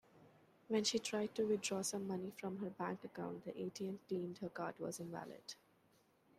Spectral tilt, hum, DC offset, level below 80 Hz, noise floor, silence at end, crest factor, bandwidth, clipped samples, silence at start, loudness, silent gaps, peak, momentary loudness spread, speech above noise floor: -4 dB/octave; none; under 0.1%; -84 dBFS; -74 dBFS; 0.85 s; 18 dB; 15.5 kHz; under 0.1%; 0.15 s; -43 LUFS; none; -26 dBFS; 11 LU; 31 dB